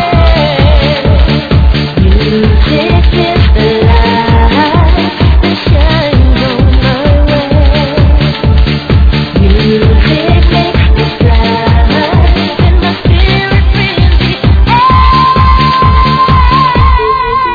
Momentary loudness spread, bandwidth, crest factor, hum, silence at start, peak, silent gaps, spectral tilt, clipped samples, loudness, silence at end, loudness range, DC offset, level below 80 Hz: 3 LU; 5 kHz; 6 dB; none; 0 s; 0 dBFS; none; -8 dB/octave; 1%; -8 LUFS; 0 s; 2 LU; under 0.1%; -10 dBFS